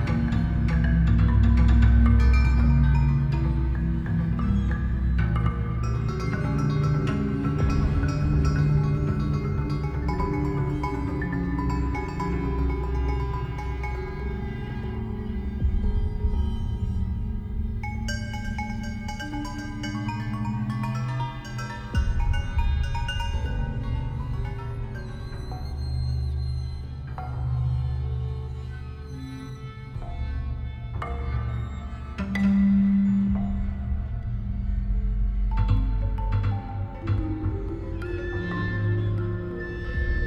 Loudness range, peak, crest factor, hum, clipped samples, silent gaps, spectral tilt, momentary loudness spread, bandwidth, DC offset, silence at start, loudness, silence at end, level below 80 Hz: 9 LU; -8 dBFS; 16 dB; none; under 0.1%; none; -8 dB/octave; 13 LU; 8 kHz; under 0.1%; 0 s; -27 LUFS; 0 s; -28 dBFS